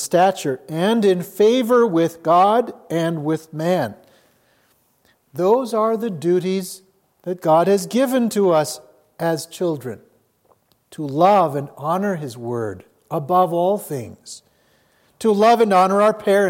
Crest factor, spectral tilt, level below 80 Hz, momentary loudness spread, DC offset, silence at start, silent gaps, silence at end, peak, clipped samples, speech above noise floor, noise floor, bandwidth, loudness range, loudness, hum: 16 dB; -5.5 dB/octave; -70 dBFS; 16 LU; under 0.1%; 0 s; none; 0 s; -2 dBFS; under 0.1%; 43 dB; -61 dBFS; 17 kHz; 5 LU; -19 LUFS; none